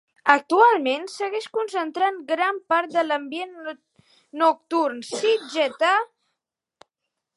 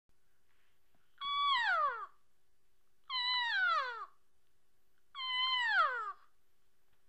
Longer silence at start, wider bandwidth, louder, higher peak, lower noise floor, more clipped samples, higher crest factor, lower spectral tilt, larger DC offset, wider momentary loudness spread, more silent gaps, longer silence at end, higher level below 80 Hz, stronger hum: second, 0.25 s vs 1.2 s; first, 11.5 kHz vs 9.6 kHz; first, -22 LUFS vs -33 LUFS; first, 0 dBFS vs -20 dBFS; about the same, -83 dBFS vs -80 dBFS; neither; about the same, 22 dB vs 18 dB; first, -2 dB/octave vs 1.5 dB/octave; neither; about the same, 15 LU vs 16 LU; neither; first, 1.3 s vs 0.95 s; about the same, -80 dBFS vs -82 dBFS; neither